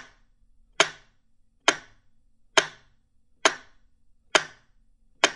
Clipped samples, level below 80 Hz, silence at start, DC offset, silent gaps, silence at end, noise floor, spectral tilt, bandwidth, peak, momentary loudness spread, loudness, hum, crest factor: under 0.1%; -64 dBFS; 0.8 s; under 0.1%; none; 0 s; -61 dBFS; 0 dB/octave; 13 kHz; -2 dBFS; 13 LU; -25 LUFS; none; 28 dB